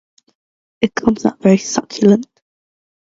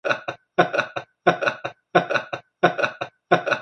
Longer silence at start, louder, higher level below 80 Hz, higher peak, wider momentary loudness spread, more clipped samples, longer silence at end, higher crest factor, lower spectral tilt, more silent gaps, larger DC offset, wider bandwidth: first, 0.8 s vs 0.05 s; first, -15 LUFS vs -23 LUFS; first, -52 dBFS vs -68 dBFS; about the same, 0 dBFS vs 0 dBFS; about the same, 8 LU vs 10 LU; neither; first, 0.8 s vs 0 s; second, 16 dB vs 22 dB; about the same, -5.5 dB/octave vs -5 dB/octave; neither; neither; second, 7.8 kHz vs 9 kHz